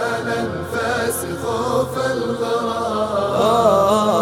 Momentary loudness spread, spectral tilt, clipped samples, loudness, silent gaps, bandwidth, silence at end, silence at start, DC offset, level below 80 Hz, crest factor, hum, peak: 9 LU; -4.5 dB/octave; under 0.1%; -19 LUFS; none; 17.5 kHz; 0 s; 0 s; under 0.1%; -48 dBFS; 16 dB; none; -2 dBFS